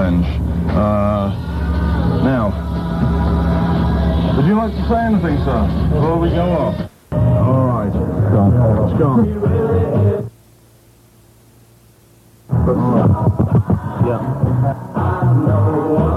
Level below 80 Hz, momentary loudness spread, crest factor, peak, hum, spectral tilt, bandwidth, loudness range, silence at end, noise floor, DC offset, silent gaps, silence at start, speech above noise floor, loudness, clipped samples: -26 dBFS; 6 LU; 12 dB; -2 dBFS; none; -9.5 dB/octave; 12 kHz; 4 LU; 0 s; -48 dBFS; under 0.1%; none; 0 s; 33 dB; -16 LUFS; under 0.1%